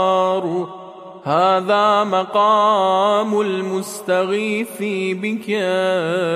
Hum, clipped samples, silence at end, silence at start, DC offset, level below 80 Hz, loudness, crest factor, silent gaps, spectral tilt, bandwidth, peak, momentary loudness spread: none; under 0.1%; 0 s; 0 s; under 0.1%; -74 dBFS; -18 LUFS; 14 dB; none; -5 dB/octave; 14.5 kHz; -4 dBFS; 9 LU